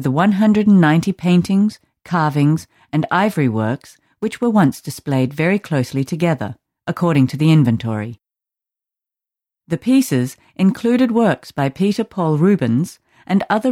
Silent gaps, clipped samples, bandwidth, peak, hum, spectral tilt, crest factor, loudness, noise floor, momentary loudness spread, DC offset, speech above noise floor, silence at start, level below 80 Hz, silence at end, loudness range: none; under 0.1%; 15.5 kHz; -2 dBFS; none; -7 dB/octave; 14 dB; -17 LUFS; -88 dBFS; 11 LU; under 0.1%; 72 dB; 0 s; -56 dBFS; 0 s; 3 LU